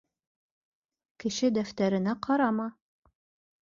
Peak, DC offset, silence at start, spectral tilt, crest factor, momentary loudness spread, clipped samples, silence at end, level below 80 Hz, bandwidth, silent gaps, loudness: -12 dBFS; under 0.1%; 1.25 s; -5.5 dB/octave; 20 dB; 8 LU; under 0.1%; 0.9 s; -70 dBFS; 7.6 kHz; none; -29 LUFS